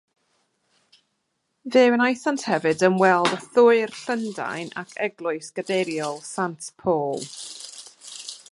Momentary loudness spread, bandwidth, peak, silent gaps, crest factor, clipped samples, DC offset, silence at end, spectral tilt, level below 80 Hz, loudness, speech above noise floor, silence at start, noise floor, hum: 18 LU; 11.5 kHz; -4 dBFS; none; 20 dB; under 0.1%; under 0.1%; 0.15 s; -4.5 dB/octave; -70 dBFS; -22 LUFS; 53 dB; 1.65 s; -75 dBFS; none